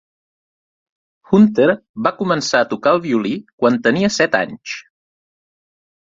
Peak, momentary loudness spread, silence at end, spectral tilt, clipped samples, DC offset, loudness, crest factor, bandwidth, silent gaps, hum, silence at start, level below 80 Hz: 0 dBFS; 11 LU; 1.35 s; -5 dB/octave; under 0.1%; under 0.1%; -16 LUFS; 18 dB; 7.8 kHz; 1.89-1.94 s, 3.53-3.58 s; none; 1.3 s; -58 dBFS